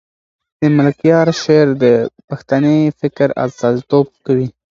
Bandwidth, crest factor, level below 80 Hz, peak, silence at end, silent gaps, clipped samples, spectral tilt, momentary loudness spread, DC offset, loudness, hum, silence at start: 7.4 kHz; 14 dB; -54 dBFS; 0 dBFS; 0.2 s; 2.24-2.28 s; under 0.1%; -7.5 dB/octave; 6 LU; under 0.1%; -14 LUFS; none; 0.6 s